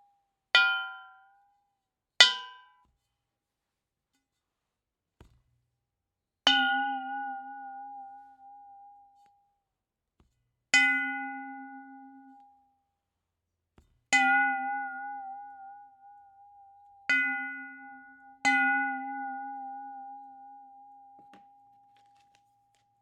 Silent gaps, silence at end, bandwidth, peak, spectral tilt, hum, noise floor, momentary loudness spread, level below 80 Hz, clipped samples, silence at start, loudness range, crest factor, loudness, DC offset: none; 2.05 s; 12.5 kHz; -2 dBFS; 1 dB/octave; none; -87 dBFS; 25 LU; -78 dBFS; under 0.1%; 0.55 s; 14 LU; 32 dB; -26 LUFS; under 0.1%